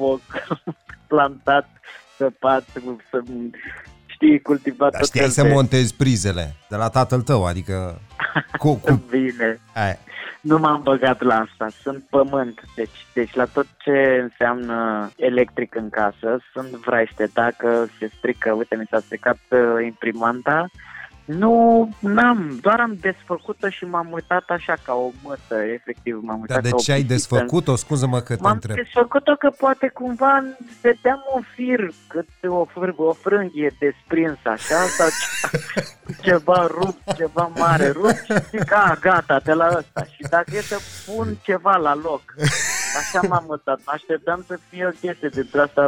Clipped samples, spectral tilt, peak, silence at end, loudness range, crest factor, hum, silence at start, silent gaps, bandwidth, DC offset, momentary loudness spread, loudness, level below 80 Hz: under 0.1%; -5.5 dB/octave; -6 dBFS; 0 s; 4 LU; 14 dB; none; 0 s; none; 17 kHz; under 0.1%; 12 LU; -20 LUFS; -50 dBFS